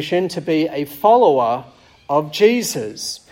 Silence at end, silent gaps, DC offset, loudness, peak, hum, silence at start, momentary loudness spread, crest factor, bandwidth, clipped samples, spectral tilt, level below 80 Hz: 0.15 s; none; under 0.1%; -17 LUFS; -2 dBFS; none; 0 s; 12 LU; 16 dB; 16.5 kHz; under 0.1%; -4.5 dB/octave; -60 dBFS